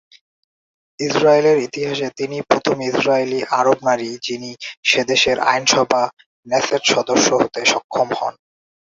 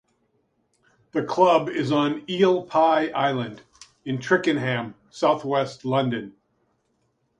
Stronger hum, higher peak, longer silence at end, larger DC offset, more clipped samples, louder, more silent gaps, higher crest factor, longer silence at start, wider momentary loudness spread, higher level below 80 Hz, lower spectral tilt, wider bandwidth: neither; first, 0 dBFS vs -4 dBFS; second, 0.6 s vs 1.1 s; neither; neither; first, -17 LUFS vs -23 LUFS; first, 4.77-4.83 s, 6.13-6.17 s, 6.26-6.43 s, 7.84-7.89 s vs none; about the same, 18 dB vs 20 dB; second, 1 s vs 1.15 s; about the same, 11 LU vs 12 LU; first, -58 dBFS vs -68 dBFS; second, -2.5 dB/octave vs -6 dB/octave; second, 8 kHz vs 10.5 kHz